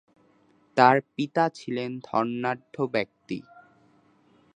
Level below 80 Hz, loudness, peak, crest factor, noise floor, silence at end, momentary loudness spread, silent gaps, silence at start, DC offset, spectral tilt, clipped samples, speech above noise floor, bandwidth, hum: -74 dBFS; -26 LUFS; -2 dBFS; 26 dB; -62 dBFS; 1.15 s; 15 LU; none; 0.75 s; under 0.1%; -6.5 dB/octave; under 0.1%; 37 dB; 10 kHz; none